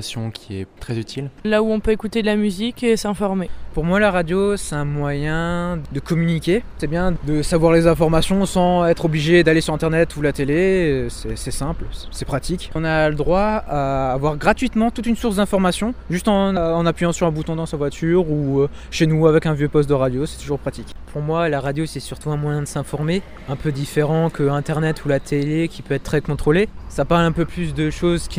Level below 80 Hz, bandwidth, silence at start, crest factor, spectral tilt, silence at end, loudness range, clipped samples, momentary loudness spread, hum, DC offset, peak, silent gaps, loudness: -34 dBFS; 16 kHz; 0 s; 18 dB; -6 dB/octave; 0 s; 5 LU; under 0.1%; 10 LU; none; under 0.1%; -2 dBFS; none; -20 LUFS